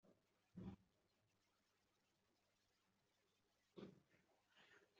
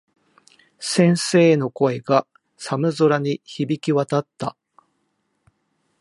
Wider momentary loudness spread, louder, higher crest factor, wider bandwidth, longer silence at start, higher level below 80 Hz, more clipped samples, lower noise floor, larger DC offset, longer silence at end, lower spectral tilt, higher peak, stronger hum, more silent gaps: second, 9 LU vs 15 LU; second, -63 LUFS vs -20 LUFS; about the same, 24 dB vs 20 dB; second, 7 kHz vs 11.5 kHz; second, 0.05 s vs 0.8 s; second, -86 dBFS vs -70 dBFS; neither; first, -86 dBFS vs -71 dBFS; neither; second, 0 s vs 1.5 s; about the same, -6.5 dB/octave vs -5.5 dB/octave; second, -44 dBFS vs -2 dBFS; neither; neither